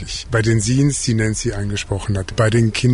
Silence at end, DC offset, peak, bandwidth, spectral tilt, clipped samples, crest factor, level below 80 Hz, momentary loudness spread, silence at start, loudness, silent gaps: 0 s; under 0.1%; -6 dBFS; 11 kHz; -5 dB/octave; under 0.1%; 12 dB; -34 dBFS; 7 LU; 0 s; -18 LUFS; none